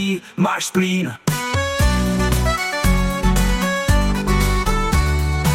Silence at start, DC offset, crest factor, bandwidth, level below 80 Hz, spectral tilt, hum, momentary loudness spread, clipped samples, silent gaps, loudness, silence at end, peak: 0 s; under 0.1%; 14 dB; 16.5 kHz; -22 dBFS; -5 dB/octave; none; 3 LU; under 0.1%; none; -19 LUFS; 0 s; -4 dBFS